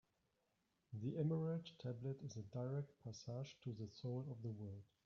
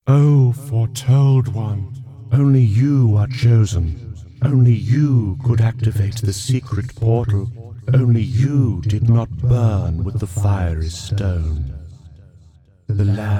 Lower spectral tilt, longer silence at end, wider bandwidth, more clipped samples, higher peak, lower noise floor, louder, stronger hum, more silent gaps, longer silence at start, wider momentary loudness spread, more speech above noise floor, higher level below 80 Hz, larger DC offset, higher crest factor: about the same, -8.5 dB/octave vs -7.5 dB/octave; first, 0.2 s vs 0 s; second, 7.2 kHz vs 12 kHz; neither; second, -30 dBFS vs -2 dBFS; first, -85 dBFS vs -49 dBFS; second, -48 LUFS vs -17 LUFS; neither; neither; first, 0.9 s vs 0.05 s; about the same, 11 LU vs 11 LU; first, 38 dB vs 33 dB; second, -82 dBFS vs -34 dBFS; neither; about the same, 18 dB vs 14 dB